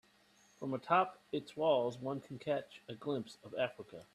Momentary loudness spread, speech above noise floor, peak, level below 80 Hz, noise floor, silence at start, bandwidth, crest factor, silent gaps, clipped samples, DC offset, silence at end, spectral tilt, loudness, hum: 13 LU; 31 dB; -16 dBFS; -78 dBFS; -68 dBFS; 0.6 s; 13 kHz; 22 dB; none; under 0.1%; under 0.1%; 0.1 s; -6 dB/octave; -38 LUFS; none